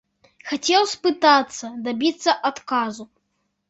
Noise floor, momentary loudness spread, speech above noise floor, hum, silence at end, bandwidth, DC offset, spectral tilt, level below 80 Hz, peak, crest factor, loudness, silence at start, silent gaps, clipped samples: -73 dBFS; 14 LU; 52 dB; none; 0.65 s; 8.2 kHz; under 0.1%; -2 dB/octave; -70 dBFS; -2 dBFS; 20 dB; -21 LUFS; 0.45 s; none; under 0.1%